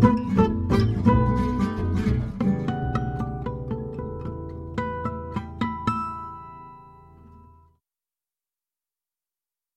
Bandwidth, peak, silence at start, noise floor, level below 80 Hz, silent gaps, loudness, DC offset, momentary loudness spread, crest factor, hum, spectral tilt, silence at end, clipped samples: 11 kHz; -4 dBFS; 0 s; under -90 dBFS; -38 dBFS; none; -26 LUFS; under 0.1%; 14 LU; 22 dB; none; -9 dB/octave; 2.35 s; under 0.1%